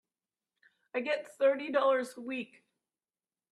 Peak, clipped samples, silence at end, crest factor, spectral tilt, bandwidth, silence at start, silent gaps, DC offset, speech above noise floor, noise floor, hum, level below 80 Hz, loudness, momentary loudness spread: -18 dBFS; under 0.1%; 1.05 s; 18 dB; -3.5 dB/octave; 12 kHz; 0.95 s; none; under 0.1%; over 59 dB; under -90 dBFS; none; -86 dBFS; -32 LUFS; 11 LU